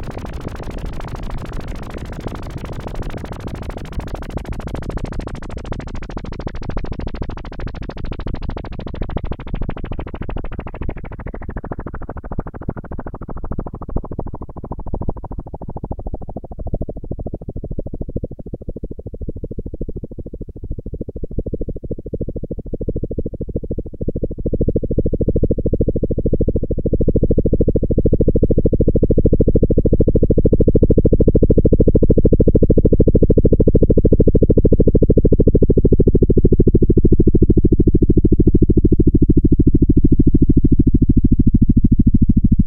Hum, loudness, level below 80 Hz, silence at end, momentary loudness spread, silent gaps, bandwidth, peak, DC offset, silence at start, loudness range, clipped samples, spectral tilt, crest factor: none; -16 LUFS; -20 dBFS; 0 s; 17 LU; none; 4.8 kHz; 0 dBFS; under 0.1%; 0 s; 16 LU; under 0.1%; -11 dB/octave; 14 dB